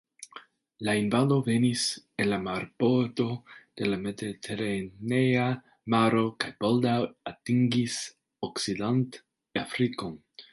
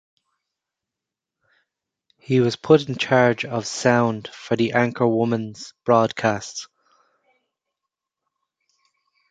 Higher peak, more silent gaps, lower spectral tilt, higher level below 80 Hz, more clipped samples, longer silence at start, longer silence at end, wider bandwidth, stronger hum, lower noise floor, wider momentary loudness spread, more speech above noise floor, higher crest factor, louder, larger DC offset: second, -10 dBFS vs -2 dBFS; neither; about the same, -5.5 dB/octave vs -5.5 dB/octave; about the same, -64 dBFS vs -62 dBFS; neither; second, 0.2 s vs 2.3 s; second, 0.1 s vs 2.65 s; first, 11.5 kHz vs 9.4 kHz; neither; second, -51 dBFS vs -86 dBFS; about the same, 13 LU vs 12 LU; second, 24 dB vs 66 dB; about the same, 18 dB vs 20 dB; second, -28 LUFS vs -20 LUFS; neither